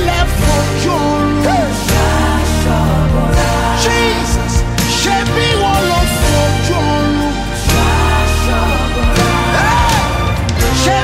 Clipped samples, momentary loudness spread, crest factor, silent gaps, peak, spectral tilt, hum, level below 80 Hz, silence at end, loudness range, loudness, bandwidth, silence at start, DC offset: under 0.1%; 3 LU; 12 dB; none; 0 dBFS; -4.5 dB/octave; none; -18 dBFS; 0 s; 0 LU; -13 LUFS; 16.5 kHz; 0 s; under 0.1%